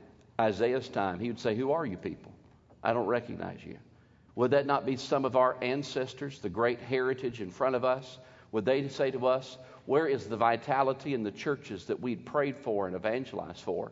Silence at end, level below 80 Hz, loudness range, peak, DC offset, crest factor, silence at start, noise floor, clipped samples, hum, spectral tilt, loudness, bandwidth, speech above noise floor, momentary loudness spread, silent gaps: 0 s; -68 dBFS; 3 LU; -12 dBFS; under 0.1%; 20 dB; 0 s; -53 dBFS; under 0.1%; none; -6 dB/octave; -31 LUFS; 7.8 kHz; 23 dB; 12 LU; none